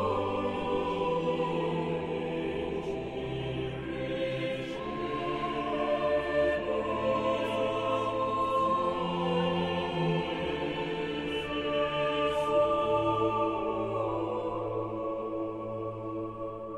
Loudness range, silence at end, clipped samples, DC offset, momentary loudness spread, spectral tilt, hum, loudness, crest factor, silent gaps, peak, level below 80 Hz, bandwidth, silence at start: 4 LU; 0 s; under 0.1%; under 0.1%; 8 LU; -6.5 dB/octave; none; -31 LUFS; 16 dB; none; -16 dBFS; -54 dBFS; 12 kHz; 0 s